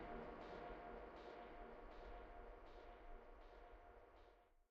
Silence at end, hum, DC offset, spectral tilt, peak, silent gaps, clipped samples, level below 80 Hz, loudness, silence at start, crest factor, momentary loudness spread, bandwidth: 0.05 s; none; under 0.1%; -4.5 dB/octave; -40 dBFS; none; under 0.1%; -64 dBFS; -59 LUFS; 0 s; 16 dB; 10 LU; 7.2 kHz